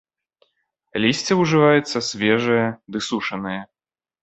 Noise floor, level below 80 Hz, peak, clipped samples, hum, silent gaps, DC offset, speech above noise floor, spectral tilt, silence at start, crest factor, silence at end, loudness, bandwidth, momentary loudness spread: under -90 dBFS; -60 dBFS; -2 dBFS; under 0.1%; none; none; under 0.1%; over 70 dB; -5 dB/octave; 0.95 s; 20 dB; 0.6 s; -20 LUFS; 8.2 kHz; 13 LU